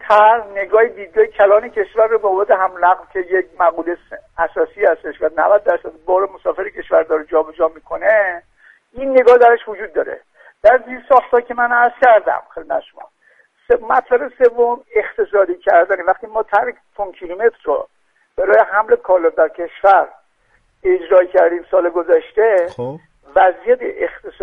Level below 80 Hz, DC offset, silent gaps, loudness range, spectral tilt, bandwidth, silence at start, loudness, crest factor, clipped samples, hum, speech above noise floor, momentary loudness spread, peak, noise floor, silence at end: -52 dBFS; under 0.1%; none; 3 LU; -6 dB/octave; 5.4 kHz; 0.05 s; -15 LUFS; 16 dB; under 0.1%; none; 44 dB; 12 LU; 0 dBFS; -58 dBFS; 0.15 s